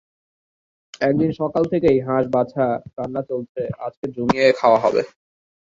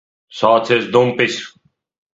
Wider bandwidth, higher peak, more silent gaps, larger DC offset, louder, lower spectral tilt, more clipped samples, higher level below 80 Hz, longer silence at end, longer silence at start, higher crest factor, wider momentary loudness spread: about the same, 7.6 kHz vs 7.8 kHz; about the same, -2 dBFS vs 0 dBFS; first, 3.49-3.55 s, 3.97-4.03 s vs none; neither; second, -20 LUFS vs -15 LUFS; first, -7 dB/octave vs -5 dB/octave; neither; first, -52 dBFS vs -60 dBFS; about the same, 0.65 s vs 0.65 s; first, 1 s vs 0.35 s; about the same, 20 dB vs 18 dB; second, 12 LU vs 18 LU